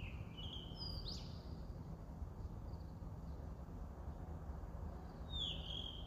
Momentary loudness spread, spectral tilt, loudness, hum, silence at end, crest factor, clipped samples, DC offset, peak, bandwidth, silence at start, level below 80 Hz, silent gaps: 8 LU; -5.5 dB/octave; -49 LUFS; none; 0 s; 16 dB; under 0.1%; under 0.1%; -32 dBFS; 15.5 kHz; 0 s; -52 dBFS; none